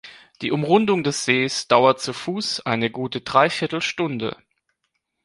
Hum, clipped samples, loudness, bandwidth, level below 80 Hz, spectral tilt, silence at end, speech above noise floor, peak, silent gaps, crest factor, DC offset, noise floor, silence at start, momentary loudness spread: none; under 0.1%; -21 LUFS; 11.5 kHz; -62 dBFS; -4.5 dB/octave; 0.9 s; 54 dB; -2 dBFS; none; 20 dB; under 0.1%; -75 dBFS; 0.05 s; 10 LU